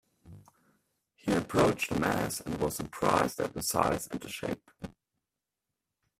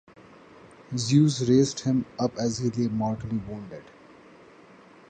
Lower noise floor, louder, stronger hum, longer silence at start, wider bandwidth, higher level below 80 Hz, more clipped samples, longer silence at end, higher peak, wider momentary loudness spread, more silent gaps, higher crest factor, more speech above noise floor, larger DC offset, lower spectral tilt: first, -88 dBFS vs -52 dBFS; second, -31 LUFS vs -25 LUFS; neither; second, 0.25 s vs 0.9 s; first, 16 kHz vs 9.6 kHz; about the same, -56 dBFS vs -58 dBFS; neither; about the same, 1.3 s vs 1.25 s; about the same, -10 dBFS vs -8 dBFS; second, 12 LU vs 17 LU; neither; first, 24 dB vs 18 dB; first, 58 dB vs 27 dB; neither; second, -4.5 dB/octave vs -6 dB/octave